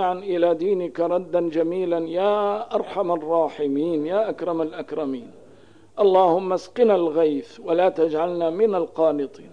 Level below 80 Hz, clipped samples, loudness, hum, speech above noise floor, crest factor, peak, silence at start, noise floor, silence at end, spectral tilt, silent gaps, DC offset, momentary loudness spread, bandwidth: -68 dBFS; under 0.1%; -22 LUFS; none; 30 dB; 16 dB; -6 dBFS; 0 s; -51 dBFS; 0.05 s; -7 dB/octave; none; 0.3%; 9 LU; 9.8 kHz